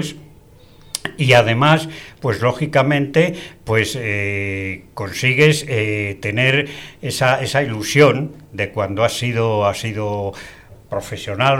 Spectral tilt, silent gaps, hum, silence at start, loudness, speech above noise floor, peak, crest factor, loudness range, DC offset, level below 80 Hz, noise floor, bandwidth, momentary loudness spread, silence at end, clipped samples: -5 dB/octave; none; none; 0 s; -18 LUFS; 27 dB; -2 dBFS; 16 dB; 3 LU; under 0.1%; -48 dBFS; -45 dBFS; 16.5 kHz; 15 LU; 0 s; under 0.1%